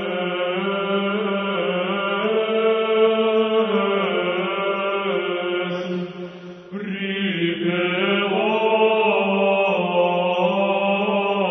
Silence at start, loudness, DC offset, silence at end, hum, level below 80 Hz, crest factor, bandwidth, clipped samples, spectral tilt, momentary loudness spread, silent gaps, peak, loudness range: 0 s; -20 LUFS; under 0.1%; 0 s; none; -70 dBFS; 14 dB; 6.2 kHz; under 0.1%; -7.5 dB/octave; 8 LU; none; -6 dBFS; 5 LU